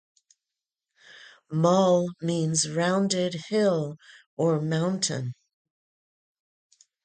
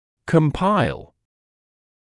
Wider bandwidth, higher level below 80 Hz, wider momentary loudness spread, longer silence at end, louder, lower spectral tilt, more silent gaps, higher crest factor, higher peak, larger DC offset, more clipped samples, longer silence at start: second, 9.6 kHz vs 11 kHz; second, -70 dBFS vs -44 dBFS; first, 12 LU vs 8 LU; first, 1.7 s vs 1.05 s; second, -25 LUFS vs -20 LUFS; second, -5 dB/octave vs -7.5 dB/octave; first, 4.26-4.37 s vs none; about the same, 18 dB vs 20 dB; second, -8 dBFS vs -2 dBFS; neither; neither; first, 1.1 s vs 0.25 s